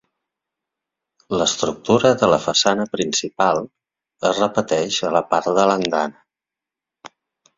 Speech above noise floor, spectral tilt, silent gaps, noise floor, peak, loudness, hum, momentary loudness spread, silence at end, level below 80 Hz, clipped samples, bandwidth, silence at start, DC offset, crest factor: 69 dB; -3.5 dB/octave; none; -87 dBFS; 0 dBFS; -19 LUFS; none; 7 LU; 0.5 s; -58 dBFS; under 0.1%; 7.8 kHz; 1.3 s; under 0.1%; 20 dB